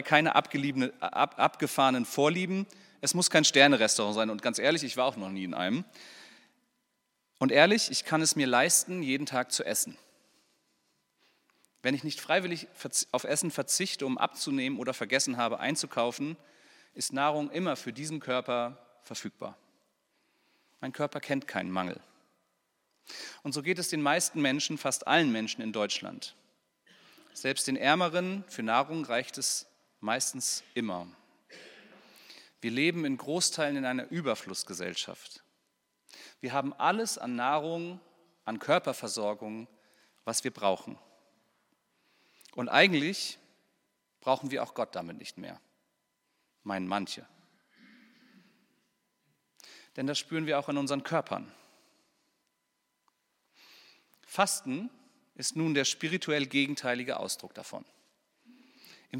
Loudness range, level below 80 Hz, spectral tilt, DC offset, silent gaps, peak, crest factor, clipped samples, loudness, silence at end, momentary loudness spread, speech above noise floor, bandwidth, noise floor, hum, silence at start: 11 LU; -84 dBFS; -3 dB/octave; under 0.1%; none; -4 dBFS; 28 dB; under 0.1%; -30 LUFS; 0 s; 17 LU; 49 dB; 17 kHz; -80 dBFS; none; 0 s